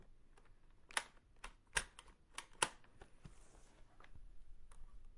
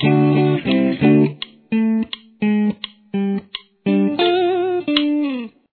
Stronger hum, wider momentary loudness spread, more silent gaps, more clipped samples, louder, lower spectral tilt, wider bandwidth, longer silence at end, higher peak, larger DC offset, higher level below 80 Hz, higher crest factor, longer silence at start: neither; first, 26 LU vs 12 LU; neither; neither; second, -44 LUFS vs -18 LUFS; second, -0.5 dB/octave vs -10 dB/octave; first, 11.5 kHz vs 4.6 kHz; second, 0 s vs 0.25 s; second, -16 dBFS vs 0 dBFS; neither; about the same, -60 dBFS vs -56 dBFS; first, 34 dB vs 18 dB; about the same, 0 s vs 0 s